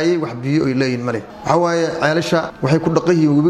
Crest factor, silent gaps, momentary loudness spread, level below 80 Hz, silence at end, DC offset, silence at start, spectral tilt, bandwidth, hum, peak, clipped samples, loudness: 16 dB; none; 5 LU; -50 dBFS; 0 s; under 0.1%; 0 s; -6.5 dB/octave; 12.5 kHz; none; 0 dBFS; under 0.1%; -17 LUFS